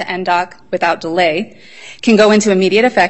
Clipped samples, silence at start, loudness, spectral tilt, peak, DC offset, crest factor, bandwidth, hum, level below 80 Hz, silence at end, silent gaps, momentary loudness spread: under 0.1%; 0 s; -13 LUFS; -4.5 dB/octave; 0 dBFS; 0.7%; 14 dB; 8.4 kHz; none; -56 dBFS; 0 s; none; 11 LU